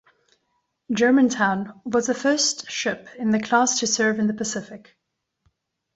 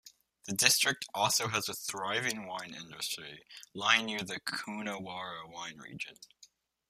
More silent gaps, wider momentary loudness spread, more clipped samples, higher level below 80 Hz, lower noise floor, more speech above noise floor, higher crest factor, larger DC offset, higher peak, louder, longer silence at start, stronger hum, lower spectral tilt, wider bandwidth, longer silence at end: neither; second, 10 LU vs 16 LU; neither; first, -64 dBFS vs -76 dBFS; first, -77 dBFS vs -64 dBFS; first, 55 dB vs 29 dB; second, 18 dB vs 30 dB; neither; about the same, -6 dBFS vs -6 dBFS; first, -22 LUFS vs -32 LUFS; first, 0.9 s vs 0.05 s; neither; first, -3 dB/octave vs -1 dB/octave; second, 8.2 kHz vs 15.5 kHz; first, 1.2 s vs 0.45 s